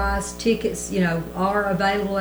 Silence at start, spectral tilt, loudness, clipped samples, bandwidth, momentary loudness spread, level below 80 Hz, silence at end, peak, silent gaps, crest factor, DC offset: 0 s; -5 dB/octave; -23 LUFS; under 0.1%; over 20 kHz; 3 LU; -36 dBFS; 0 s; -8 dBFS; none; 14 dB; under 0.1%